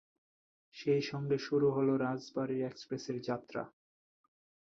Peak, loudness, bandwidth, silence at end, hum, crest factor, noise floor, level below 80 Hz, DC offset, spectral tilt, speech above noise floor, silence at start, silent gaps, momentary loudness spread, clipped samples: -20 dBFS; -35 LUFS; 7.2 kHz; 1.1 s; none; 18 dB; under -90 dBFS; -76 dBFS; under 0.1%; -7 dB/octave; over 56 dB; 0.75 s; none; 12 LU; under 0.1%